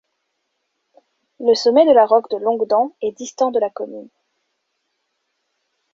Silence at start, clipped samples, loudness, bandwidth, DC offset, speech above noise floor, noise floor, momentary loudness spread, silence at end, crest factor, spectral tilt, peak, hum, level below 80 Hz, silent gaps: 1.4 s; under 0.1%; -17 LUFS; 7.6 kHz; under 0.1%; 57 dB; -73 dBFS; 15 LU; 1.9 s; 18 dB; -3.5 dB/octave; -2 dBFS; none; -68 dBFS; none